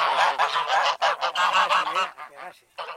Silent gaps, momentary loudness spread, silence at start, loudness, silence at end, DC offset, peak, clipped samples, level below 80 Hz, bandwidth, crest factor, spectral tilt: none; 19 LU; 0 s; -22 LUFS; 0 s; under 0.1%; -6 dBFS; under 0.1%; -74 dBFS; 16 kHz; 18 dB; 0 dB/octave